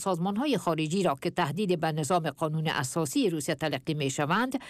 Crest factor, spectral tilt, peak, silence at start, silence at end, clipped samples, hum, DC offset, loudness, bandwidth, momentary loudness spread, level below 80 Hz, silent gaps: 12 dB; -5 dB/octave; -16 dBFS; 0 s; 0 s; under 0.1%; none; under 0.1%; -29 LUFS; 15.5 kHz; 3 LU; -66 dBFS; none